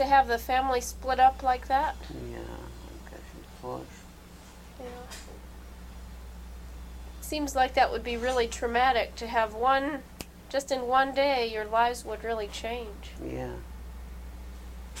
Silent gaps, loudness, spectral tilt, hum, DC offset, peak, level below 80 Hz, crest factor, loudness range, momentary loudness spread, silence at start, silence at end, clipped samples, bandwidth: none; -28 LUFS; -4 dB/octave; none; under 0.1%; -10 dBFS; -44 dBFS; 20 dB; 17 LU; 21 LU; 0 s; 0 s; under 0.1%; 16.5 kHz